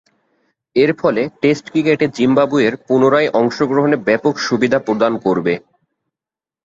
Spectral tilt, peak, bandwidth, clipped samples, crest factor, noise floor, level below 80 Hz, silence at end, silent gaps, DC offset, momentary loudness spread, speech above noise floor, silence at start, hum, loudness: -6 dB/octave; -2 dBFS; 7.8 kHz; under 0.1%; 14 dB; -89 dBFS; -58 dBFS; 1.05 s; none; under 0.1%; 4 LU; 74 dB; 0.75 s; none; -15 LUFS